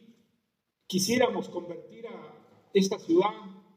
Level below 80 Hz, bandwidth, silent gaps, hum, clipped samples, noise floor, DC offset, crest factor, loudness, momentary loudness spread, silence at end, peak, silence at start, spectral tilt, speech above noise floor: -76 dBFS; 16 kHz; none; none; under 0.1%; -79 dBFS; under 0.1%; 18 dB; -28 LUFS; 19 LU; 0.2 s; -12 dBFS; 0.9 s; -4.5 dB/octave; 51 dB